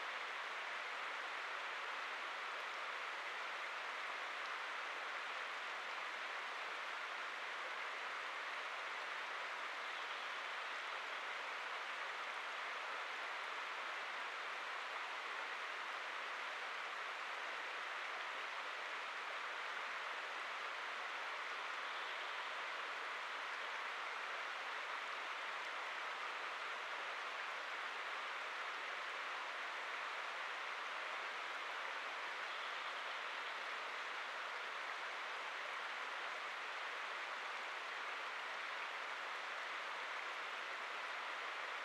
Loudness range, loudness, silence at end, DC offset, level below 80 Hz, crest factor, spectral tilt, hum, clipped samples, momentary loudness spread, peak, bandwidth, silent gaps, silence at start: 0 LU; -44 LUFS; 0 s; under 0.1%; under -90 dBFS; 14 dB; 1 dB/octave; none; under 0.1%; 1 LU; -32 dBFS; 13.5 kHz; none; 0 s